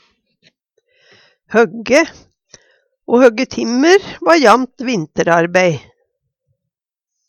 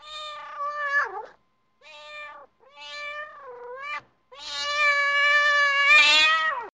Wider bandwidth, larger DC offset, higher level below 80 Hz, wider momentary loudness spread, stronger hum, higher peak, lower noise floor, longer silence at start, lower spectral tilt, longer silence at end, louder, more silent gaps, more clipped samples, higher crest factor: first, 13.5 kHz vs 10 kHz; neither; first, -56 dBFS vs -66 dBFS; second, 9 LU vs 24 LU; neither; first, 0 dBFS vs -8 dBFS; first, -81 dBFS vs -65 dBFS; first, 1.5 s vs 0.05 s; first, -4.5 dB/octave vs 1.5 dB/octave; first, 1.5 s vs 0.05 s; first, -13 LUFS vs -19 LUFS; neither; neither; about the same, 16 dB vs 18 dB